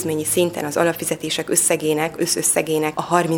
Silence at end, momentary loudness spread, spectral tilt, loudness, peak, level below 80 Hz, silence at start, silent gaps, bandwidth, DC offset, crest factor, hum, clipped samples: 0 s; 5 LU; -3 dB/octave; -19 LUFS; -2 dBFS; -58 dBFS; 0 s; none; 19.5 kHz; under 0.1%; 18 dB; none; under 0.1%